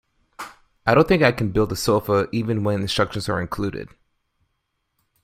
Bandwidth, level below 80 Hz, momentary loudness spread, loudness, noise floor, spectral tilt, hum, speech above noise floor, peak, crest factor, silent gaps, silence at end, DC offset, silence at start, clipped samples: 16 kHz; -44 dBFS; 21 LU; -21 LUFS; -74 dBFS; -5.5 dB/octave; none; 54 dB; -2 dBFS; 22 dB; none; 1.4 s; under 0.1%; 0.4 s; under 0.1%